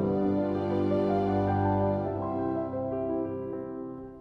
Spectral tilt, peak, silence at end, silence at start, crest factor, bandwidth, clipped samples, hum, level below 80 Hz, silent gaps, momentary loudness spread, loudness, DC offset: -10.5 dB/octave; -16 dBFS; 0 s; 0 s; 14 dB; 5.8 kHz; under 0.1%; none; -54 dBFS; none; 10 LU; -29 LUFS; under 0.1%